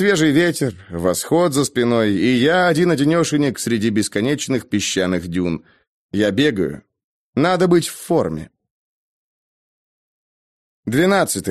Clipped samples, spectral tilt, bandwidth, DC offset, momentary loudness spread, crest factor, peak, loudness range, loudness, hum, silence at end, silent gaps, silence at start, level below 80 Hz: under 0.1%; -5 dB/octave; 13 kHz; under 0.1%; 9 LU; 16 dB; -2 dBFS; 7 LU; -18 LUFS; none; 0 s; 5.87-6.09 s, 7.04-7.33 s, 8.70-10.83 s; 0 s; -52 dBFS